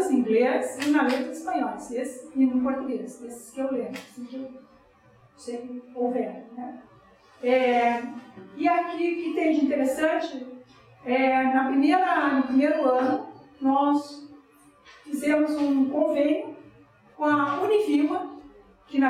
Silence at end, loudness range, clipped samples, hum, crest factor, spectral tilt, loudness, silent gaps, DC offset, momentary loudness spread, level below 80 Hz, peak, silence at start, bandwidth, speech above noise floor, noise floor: 0 s; 10 LU; under 0.1%; none; 16 dB; -4.5 dB/octave; -25 LUFS; none; under 0.1%; 17 LU; -68 dBFS; -10 dBFS; 0 s; 14 kHz; 33 dB; -57 dBFS